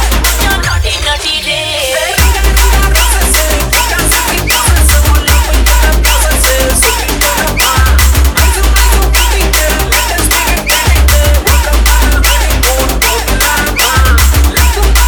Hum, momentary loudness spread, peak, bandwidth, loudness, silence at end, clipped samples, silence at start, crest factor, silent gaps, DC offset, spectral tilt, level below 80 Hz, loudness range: none; 3 LU; 0 dBFS; over 20 kHz; -9 LUFS; 0 s; 0.4%; 0 s; 8 dB; none; under 0.1%; -3 dB/octave; -10 dBFS; 1 LU